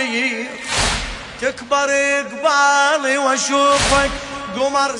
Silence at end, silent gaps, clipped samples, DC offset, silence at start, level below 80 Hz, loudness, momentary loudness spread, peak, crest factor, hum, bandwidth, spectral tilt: 0 s; none; under 0.1%; under 0.1%; 0 s; -36 dBFS; -17 LUFS; 10 LU; -2 dBFS; 16 dB; none; 11 kHz; -2 dB/octave